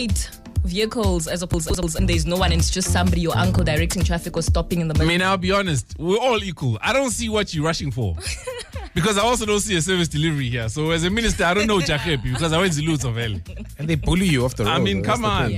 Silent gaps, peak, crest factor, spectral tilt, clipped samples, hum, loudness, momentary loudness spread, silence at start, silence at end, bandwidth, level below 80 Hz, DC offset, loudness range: none; -8 dBFS; 14 dB; -4.5 dB/octave; under 0.1%; none; -21 LUFS; 7 LU; 0 s; 0 s; 16 kHz; -30 dBFS; under 0.1%; 2 LU